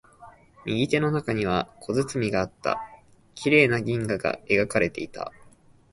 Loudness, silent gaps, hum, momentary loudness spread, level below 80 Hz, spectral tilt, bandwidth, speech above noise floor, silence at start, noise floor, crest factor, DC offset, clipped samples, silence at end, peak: -25 LUFS; none; none; 14 LU; -54 dBFS; -5.5 dB/octave; 11.5 kHz; 29 dB; 0.2 s; -54 dBFS; 22 dB; under 0.1%; under 0.1%; 0.65 s; -4 dBFS